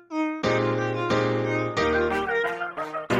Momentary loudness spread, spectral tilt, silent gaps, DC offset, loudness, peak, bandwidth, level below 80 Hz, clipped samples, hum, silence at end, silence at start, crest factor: 6 LU; -6 dB/octave; none; under 0.1%; -25 LUFS; -10 dBFS; 11.5 kHz; -50 dBFS; under 0.1%; none; 0 s; 0.1 s; 14 dB